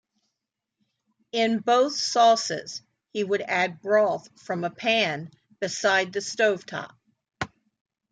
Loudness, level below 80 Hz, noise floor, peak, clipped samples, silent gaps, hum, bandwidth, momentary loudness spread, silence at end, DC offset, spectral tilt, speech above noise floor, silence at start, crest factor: -24 LUFS; -70 dBFS; -85 dBFS; -8 dBFS; under 0.1%; none; none; 9.4 kHz; 16 LU; 0.65 s; under 0.1%; -3 dB/octave; 60 dB; 1.35 s; 18 dB